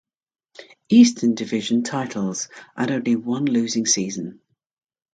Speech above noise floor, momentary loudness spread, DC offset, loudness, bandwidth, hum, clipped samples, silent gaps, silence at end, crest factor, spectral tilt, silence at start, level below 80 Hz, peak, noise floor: 27 dB; 14 LU; under 0.1%; -20 LUFS; 9.2 kHz; none; under 0.1%; none; 0.8 s; 18 dB; -4 dB/octave; 0.6 s; -68 dBFS; -2 dBFS; -47 dBFS